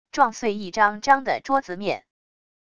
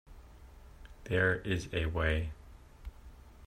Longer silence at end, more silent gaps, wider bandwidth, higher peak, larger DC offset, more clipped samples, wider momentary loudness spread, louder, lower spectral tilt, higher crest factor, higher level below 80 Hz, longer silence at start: first, 0.8 s vs 0 s; neither; second, 9.4 kHz vs 13 kHz; first, -4 dBFS vs -16 dBFS; first, 0.5% vs under 0.1%; neither; second, 9 LU vs 23 LU; first, -23 LUFS vs -33 LUFS; second, -4 dB/octave vs -6 dB/octave; about the same, 20 dB vs 20 dB; second, -60 dBFS vs -46 dBFS; about the same, 0.15 s vs 0.05 s